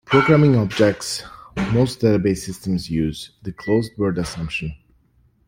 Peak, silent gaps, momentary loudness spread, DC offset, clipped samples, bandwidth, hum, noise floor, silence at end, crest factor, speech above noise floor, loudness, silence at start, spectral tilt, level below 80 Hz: -2 dBFS; none; 15 LU; under 0.1%; under 0.1%; 16.5 kHz; none; -59 dBFS; 0.75 s; 18 dB; 40 dB; -20 LUFS; 0.1 s; -6 dB/octave; -44 dBFS